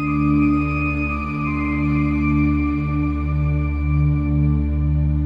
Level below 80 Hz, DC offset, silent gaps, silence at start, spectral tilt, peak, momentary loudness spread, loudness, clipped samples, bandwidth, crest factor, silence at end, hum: -26 dBFS; under 0.1%; none; 0 s; -10 dB/octave; -8 dBFS; 4 LU; -20 LUFS; under 0.1%; 5.2 kHz; 10 dB; 0 s; none